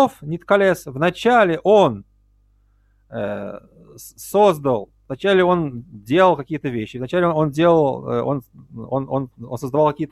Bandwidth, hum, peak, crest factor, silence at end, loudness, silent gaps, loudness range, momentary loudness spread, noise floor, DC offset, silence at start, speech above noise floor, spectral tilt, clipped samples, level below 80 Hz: 14.5 kHz; 50 Hz at -50 dBFS; -2 dBFS; 16 dB; 0.05 s; -19 LUFS; none; 3 LU; 15 LU; -58 dBFS; under 0.1%; 0 s; 39 dB; -6.5 dB/octave; under 0.1%; -54 dBFS